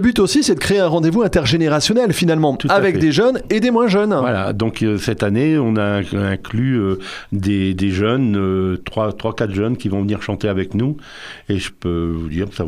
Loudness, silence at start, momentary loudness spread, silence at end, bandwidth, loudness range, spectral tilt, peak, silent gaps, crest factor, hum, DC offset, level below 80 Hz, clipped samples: -17 LUFS; 0 s; 8 LU; 0 s; 15.5 kHz; 6 LU; -6 dB/octave; -2 dBFS; none; 14 dB; none; under 0.1%; -42 dBFS; under 0.1%